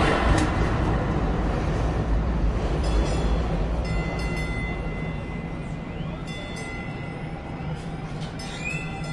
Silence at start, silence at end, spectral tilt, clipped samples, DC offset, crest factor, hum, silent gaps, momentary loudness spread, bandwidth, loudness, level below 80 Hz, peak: 0 s; 0 s; -6.5 dB/octave; under 0.1%; under 0.1%; 18 dB; none; none; 9 LU; 11.5 kHz; -27 LUFS; -28 dBFS; -8 dBFS